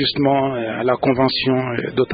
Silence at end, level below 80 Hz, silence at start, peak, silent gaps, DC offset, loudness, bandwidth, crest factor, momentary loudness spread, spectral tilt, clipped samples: 0 s; -50 dBFS; 0 s; -2 dBFS; none; under 0.1%; -18 LUFS; 5 kHz; 16 dB; 5 LU; -11 dB/octave; under 0.1%